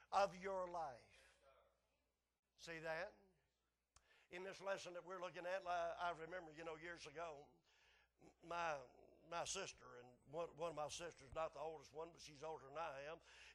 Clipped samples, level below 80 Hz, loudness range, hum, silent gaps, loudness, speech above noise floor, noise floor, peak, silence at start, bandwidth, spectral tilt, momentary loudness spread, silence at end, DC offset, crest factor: under 0.1%; -78 dBFS; 5 LU; none; 2.39-2.43 s; -50 LUFS; over 40 dB; under -90 dBFS; -28 dBFS; 0 s; 12 kHz; -3 dB/octave; 11 LU; 0 s; under 0.1%; 24 dB